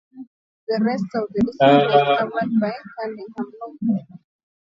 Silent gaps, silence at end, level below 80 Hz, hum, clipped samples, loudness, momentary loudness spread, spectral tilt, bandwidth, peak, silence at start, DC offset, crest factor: 0.27-0.67 s; 0.55 s; -56 dBFS; none; under 0.1%; -20 LUFS; 17 LU; -7.5 dB/octave; 7.4 kHz; -2 dBFS; 0.15 s; under 0.1%; 18 dB